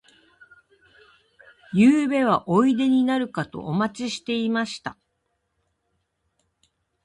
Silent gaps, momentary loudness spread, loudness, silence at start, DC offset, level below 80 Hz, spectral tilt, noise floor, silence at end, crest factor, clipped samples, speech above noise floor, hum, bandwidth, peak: none; 13 LU; -22 LUFS; 1.7 s; under 0.1%; -64 dBFS; -6 dB/octave; -75 dBFS; 2.15 s; 18 dB; under 0.1%; 53 dB; none; 11 kHz; -6 dBFS